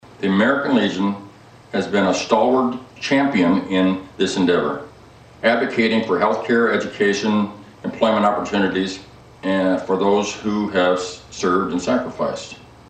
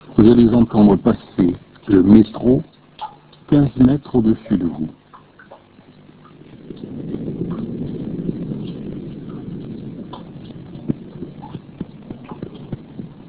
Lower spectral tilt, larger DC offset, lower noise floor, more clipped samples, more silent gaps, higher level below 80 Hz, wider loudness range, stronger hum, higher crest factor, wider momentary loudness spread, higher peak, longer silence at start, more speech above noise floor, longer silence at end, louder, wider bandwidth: second, -5 dB/octave vs -13 dB/octave; neither; about the same, -45 dBFS vs -46 dBFS; neither; neither; second, -54 dBFS vs -40 dBFS; second, 2 LU vs 16 LU; neither; about the same, 16 dB vs 18 dB; second, 10 LU vs 23 LU; second, -4 dBFS vs 0 dBFS; about the same, 0.1 s vs 0.05 s; second, 26 dB vs 33 dB; first, 0.35 s vs 0.15 s; about the same, -19 LUFS vs -17 LUFS; first, 9 kHz vs 4 kHz